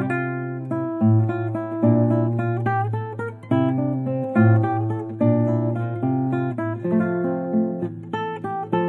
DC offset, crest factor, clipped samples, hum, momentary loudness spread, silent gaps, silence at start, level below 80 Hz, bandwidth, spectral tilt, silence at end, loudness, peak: under 0.1%; 16 dB; under 0.1%; none; 9 LU; none; 0 s; -66 dBFS; 4.1 kHz; -10.5 dB/octave; 0 s; -22 LUFS; -6 dBFS